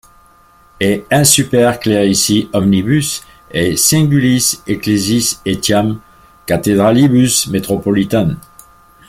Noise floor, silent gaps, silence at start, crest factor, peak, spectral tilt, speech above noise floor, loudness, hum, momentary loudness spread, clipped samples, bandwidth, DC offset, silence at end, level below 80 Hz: -47 dBFS; none; 0.8 s; 14 dB; 0 dBFS; -4.5 dB/octave; 34 dB; -13 LUFS; none; 9 LU; under 0.1%; 16.5 kHz; under 0.1%; 0.7 s; -42 dBFS